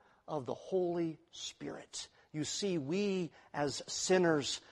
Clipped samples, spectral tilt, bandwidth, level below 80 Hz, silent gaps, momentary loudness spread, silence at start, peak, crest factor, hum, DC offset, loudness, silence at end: under 0.1%; -4 dB/octave; 12 kHz; -72 dBFS; none; 14 LU; 0.3 s; -16 dBFS; 20 dB; none; under 0.1%; -36 LUFS; 0.15 s